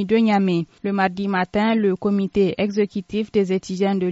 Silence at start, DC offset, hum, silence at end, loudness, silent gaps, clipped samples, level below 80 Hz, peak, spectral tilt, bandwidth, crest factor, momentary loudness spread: 0 s; under 0.1%; none; 0 s; -21 LUFS; none; under 0.1%; -54 dBFS; -6 dBFS; -5.5 dB/octave; 8 kHz; 14 dB; 5 LU